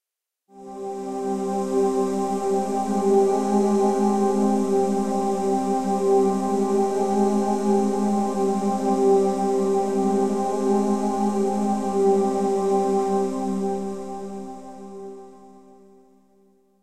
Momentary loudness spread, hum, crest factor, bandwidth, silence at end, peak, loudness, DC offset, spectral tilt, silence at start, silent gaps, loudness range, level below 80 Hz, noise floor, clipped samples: 13 LU; none; 14 dB; 12.5 kHz; 0 s; -8 dBFS; -22 LUFS; 0.9%; -7 dB/octave; 0 s; none; 5 LU; -56 dBFS; -74 dBFS; under 0.1%